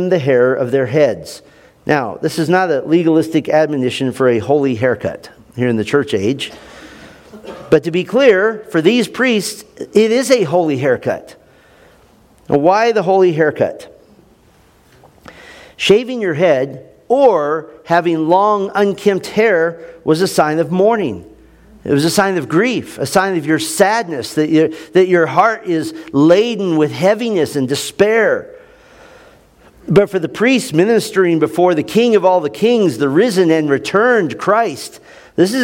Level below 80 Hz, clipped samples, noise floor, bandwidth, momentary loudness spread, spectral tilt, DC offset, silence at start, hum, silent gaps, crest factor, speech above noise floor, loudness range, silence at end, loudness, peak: -54 dBFS; under 0.1%; -49 dBFS; 17 kHz; 8 LU; -5.5 dB/octave; under 0.1%; 0 s; none; none; 14 dB; 36 dB; 4 LU; 0 s; -14 LUFS; 0 dBFS